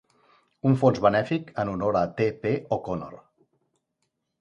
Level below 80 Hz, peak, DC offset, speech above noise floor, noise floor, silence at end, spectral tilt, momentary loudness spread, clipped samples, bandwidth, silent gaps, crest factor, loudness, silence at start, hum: -56 dBFS; -6 dBFS; under 0.1%; 54 dB; -78 dBFS; 1.25 s; -8 dB/octave; 10 LU; under 0.1%; 9.2 kHz; none; 22 dB; -25 LUFS; 0.65 s; none